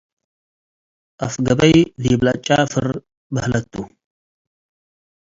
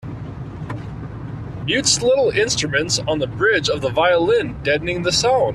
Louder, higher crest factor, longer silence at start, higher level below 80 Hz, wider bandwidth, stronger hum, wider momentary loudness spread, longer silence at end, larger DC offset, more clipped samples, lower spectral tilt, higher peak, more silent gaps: about the same, -18 LUFS vs -18 LUFS; about the same, 20 dB vs 16 dB; first, 1.2 s vs 0.05 s; about the same, -44 dBFS vs -42 dBFS; second, 7.8 kHz vs 13 kHz; neither; about the same, 17 LU vs 16 LU; first, 1.45 s vs 0 s; neither; neither; first, -5.5 dB/octave vs -3.5 dB/octave; first, 0 dBFS vs -4 dBFS; first, 3.17-3.30 s vs none